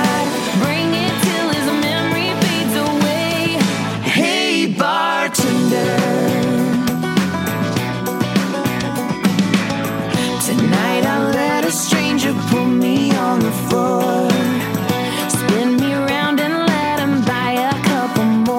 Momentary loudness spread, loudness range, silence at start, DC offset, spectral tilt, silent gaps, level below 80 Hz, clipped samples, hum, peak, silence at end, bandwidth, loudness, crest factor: 4 LU; 2 LU; 0 s; under 0.1%; -4.5 dB/octave; none; -52 dBFS; under 0.1%; none; -2 dBFS; 0 s; 17 kHz; -17 LUFS; 16 dB